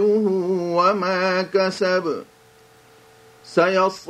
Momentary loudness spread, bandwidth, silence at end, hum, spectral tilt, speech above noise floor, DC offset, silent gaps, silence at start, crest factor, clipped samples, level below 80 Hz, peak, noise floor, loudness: 5 LU; 12.5 kHz; 0 s; none; -5.5 dB/octave; 31 dB; under 0.1%; none; 0 s; 16 dB; under 0.1%; -70 dBFS; -4 dBFS; -51 dBFS; -20 LUFS